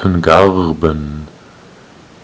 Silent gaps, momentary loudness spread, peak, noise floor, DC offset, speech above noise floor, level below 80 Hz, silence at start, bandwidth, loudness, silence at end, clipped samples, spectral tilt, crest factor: none; 20 LU; 0 dBFS; -40 dBFS; under 0.1%; 28 dB; -30 dBFS; 0 s; 8 kHz; -12 LUFS; 0.95 s; 1%; -7 dB/octave; 14 dB